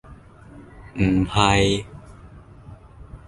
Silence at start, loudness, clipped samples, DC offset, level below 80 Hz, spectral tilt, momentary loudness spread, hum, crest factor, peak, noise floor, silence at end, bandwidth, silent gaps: 0.1 s; -20 LUFS; under 0.1%; under 0.1%; -38 dBFS; -5 dB/octave; 23 LU; none; 22 dB; -2 dBFS; -45 dBFS; 0.1 s; 11.5 kHz; none